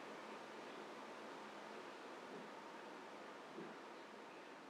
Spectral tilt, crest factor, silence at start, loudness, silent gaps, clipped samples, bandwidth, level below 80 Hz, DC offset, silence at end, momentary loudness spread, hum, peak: -3.5 dB/octave; 14 dB; 0 s; -54 LUFS; none; under 0.1%; 14 kHz; under -90 dBFS; under 0.1%; 0 s; 2 LU; none; -40 dBFS